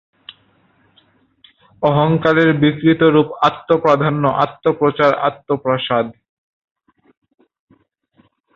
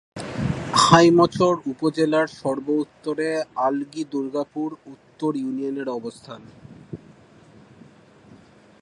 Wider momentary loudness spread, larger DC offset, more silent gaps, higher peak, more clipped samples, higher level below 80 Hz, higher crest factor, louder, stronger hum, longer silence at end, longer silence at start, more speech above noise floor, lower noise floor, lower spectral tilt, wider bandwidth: second, 7 LU vs 25 LU; neither; neither; about the same, 0 dBFS vs 0 dBFS; neither; about the same, -54 dBFS vs -54 dBFS; second, 16 dB vs 22 dB; first, -15 LUFS vs -22 LUFS; neither; first, 2.45 s vs 1.85 s; first, 1.8 s vs 0.15 s; first, 43 dB vs 29 dB; first, -58 dBFS vs -50 dBFS; first, -8 dB/octave vs -5 dB/octave; second, 7 kHz vs 11.5 kHz